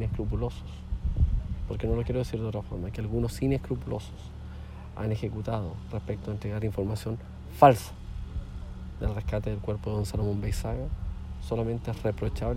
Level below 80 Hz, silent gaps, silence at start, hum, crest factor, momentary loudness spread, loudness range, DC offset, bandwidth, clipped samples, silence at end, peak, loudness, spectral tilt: -36 dBFS; none; 0 s; none; 26 dB; 12 LU; 6 LU; under 0.1%; 16 kHz; under 0.1%; 0 s; -4 dBFS; -30 LUFS; -7.5 dB/octave